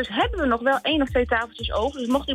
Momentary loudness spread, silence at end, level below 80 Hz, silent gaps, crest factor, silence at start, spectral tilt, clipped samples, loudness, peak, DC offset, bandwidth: 4 LU; 0 s; -38 dBFS; none; 14 dB; 0 s; -5.5 dB/octave; under 0.1%; -23 LUFS; -10 dBFS; under 0.1%; 15.5 kHz